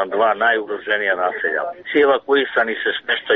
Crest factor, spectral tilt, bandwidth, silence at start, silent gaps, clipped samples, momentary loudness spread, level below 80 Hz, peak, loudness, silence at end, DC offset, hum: 14 dB; 0.5 dB/octave; 4.6 kHz; 0 s; none; under 0.1%; 6 LU; -64 dBFS; -4 dBFS; -18 LUFS; 0 s; under 0.1%; none